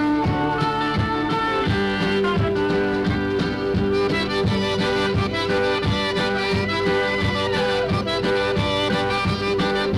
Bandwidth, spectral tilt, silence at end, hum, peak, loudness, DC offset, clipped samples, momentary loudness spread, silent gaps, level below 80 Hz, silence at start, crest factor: 12.5 kHz; -6 dB/octave; 0 s; none; -8 dBFS; -21 LUFS; 0.2%; under 0.1%; 1 LU; none; -40 dBFS; 0 s; 12 dB